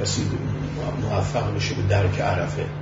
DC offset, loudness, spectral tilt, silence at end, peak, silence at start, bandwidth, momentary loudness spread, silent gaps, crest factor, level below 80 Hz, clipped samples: under 0.1%; -24 LUFS; -5.5 dB/octave; 0 s; -8 dBFS; 0 s; 7.8 kHz; 6 LU; none; 14 dB; -40 dBFS; under 0.1%